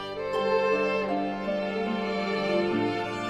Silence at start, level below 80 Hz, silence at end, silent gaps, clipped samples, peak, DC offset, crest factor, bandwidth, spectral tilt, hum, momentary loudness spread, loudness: 0 s; -58 dBFS; 0 s; none; under 0.1%; -12 dBFS; under 0.1%; 14 dB; 11.5 kHz; -6 dB/octave; none; 5 LU; -27 LUFS